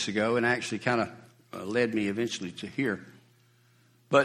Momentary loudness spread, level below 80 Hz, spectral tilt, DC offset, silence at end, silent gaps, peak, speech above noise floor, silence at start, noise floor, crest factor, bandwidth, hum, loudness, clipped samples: 10 LU; -70 dBFS; -5 dB/octave; under 0.1%; 0 s; none; -8 dBFS; 34 dB; 0 s; -63 dBFS; 22 dB; 14 kHz; none; -29 LUFS; under 0.1%